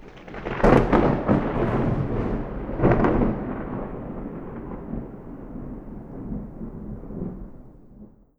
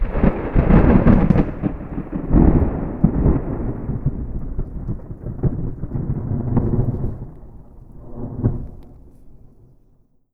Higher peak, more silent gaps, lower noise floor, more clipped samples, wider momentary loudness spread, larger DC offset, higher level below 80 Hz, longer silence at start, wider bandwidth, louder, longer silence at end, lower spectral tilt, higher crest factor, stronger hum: about the same, -2 dBFS vs 0 dBFS; neither; second, -48 dBFS vs -55 dBFS; neither; first, 19 LU vs 16 LU; neither; second, -34 dBFS vs -24 dBFS; about the same, 0 s vs 0 s; first, 8.2 kHz vs 4 kHz; second, -24 LUFS vs -20 LUFS; second, 0.3 s vs 1 s; second, -9 dB/octave vs -12 dB/octave; first, 24 dB vs 18 dB; neither